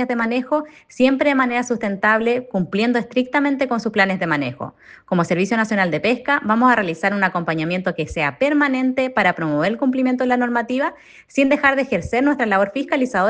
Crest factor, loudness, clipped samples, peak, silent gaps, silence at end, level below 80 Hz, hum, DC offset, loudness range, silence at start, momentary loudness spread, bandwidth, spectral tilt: 18 dB; -19 LUFS; under 0.1%; 0 dBFS; none; 0 s; -52 dBFS; none; under 0.1%; 1 LU; 0 s; 6 LU; 9.2 kHz; -6 dB/octave